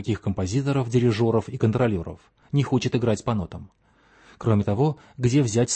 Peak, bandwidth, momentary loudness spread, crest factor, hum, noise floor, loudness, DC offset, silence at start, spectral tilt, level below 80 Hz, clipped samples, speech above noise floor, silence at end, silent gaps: -8 dBFS; 8.8 kHz; 8 LU; 16 dB; none; -57 dBFS; -24 LUFS; under 0.1%; 0 s; -6.5 dB/octave; -50 dBFS; under 0.1%; 34 dB; 0 s; none